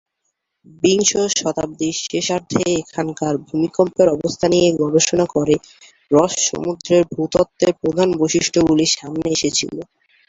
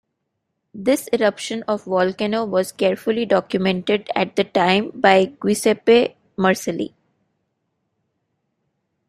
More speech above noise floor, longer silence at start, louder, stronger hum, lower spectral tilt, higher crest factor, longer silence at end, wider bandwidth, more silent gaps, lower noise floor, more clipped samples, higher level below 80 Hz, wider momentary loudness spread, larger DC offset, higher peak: about the same, 56 dB vs 57 dB; about the same, 0.85 s vs 0.75 s; about the same, -18 LUFS vs -19 LUFS; neither; about the same, -4 dB/octave vs -5 dB/octave; about the same, 16 dB vs 20 dB; second, 0.45 s vs 2.2 s; second, 8 kHz vs 16 kHz; neither; about the same, -73 dBFS vs -76 dBFS; neither; first, -50 dBFS vs -62 dBFS; about the same, 7 LU vs 9 LU; neither; about the same, -2 dBFS vs -2 dBFS